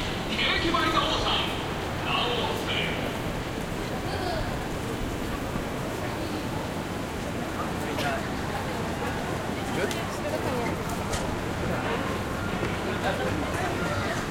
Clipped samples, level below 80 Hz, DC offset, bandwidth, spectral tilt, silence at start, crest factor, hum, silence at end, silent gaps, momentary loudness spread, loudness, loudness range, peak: under 0.1%; -42 dBFS; under 0.1%; 16.5 kHz; -4.5 dB/octave; 0 s; 16 dB; none; 0 s; none; 7 LU; -29 LUFS; 5 LU; -12 dBFS